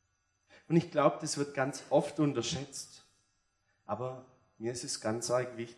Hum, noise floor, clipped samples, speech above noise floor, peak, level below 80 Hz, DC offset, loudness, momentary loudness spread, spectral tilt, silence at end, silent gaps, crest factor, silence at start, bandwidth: none; -77 dBFS; under 0.1%; 44 dB; -10 dBFS; -74 dBFS; under 0.1%; -33 LUFS; 12 LU; -5 dB/octave; 0.05 s; none; 24 dB; 0.7 s; 12 kHz